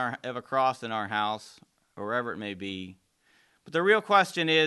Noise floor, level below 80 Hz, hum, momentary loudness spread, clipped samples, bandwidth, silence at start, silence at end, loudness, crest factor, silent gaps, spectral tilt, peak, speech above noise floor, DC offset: -66 dBFS; -68 dBFS; none; 15 LU; under 0.1%; 12.5 kHz; 0 s; 0 s; -28 LUFS; 20 dB; none; -4.5 dB/octave; -8 dBFS; 38 dB; under 0.1%